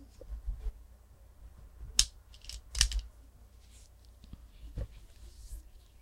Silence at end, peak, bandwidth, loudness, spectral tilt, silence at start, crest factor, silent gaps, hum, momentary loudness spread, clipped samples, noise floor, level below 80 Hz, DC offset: 0 s; -4 dBFS; 16.5 kHz; -34 LUFS; -0.5 dB/octave; 0 s; 36 dB; none; none; 28 LU; under 0.1%; -57 dBFS; -44 dBFS; under 0.1%